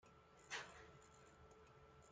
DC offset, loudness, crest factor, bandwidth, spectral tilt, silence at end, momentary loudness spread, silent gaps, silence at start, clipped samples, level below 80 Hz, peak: under 0.1%; -58 LUFS; 24 dB; 9 kHz; -2 dB/octave; 0 s; 15 LU; none; 0 s; under 0.1%; -76 dBFS; -36 dBFS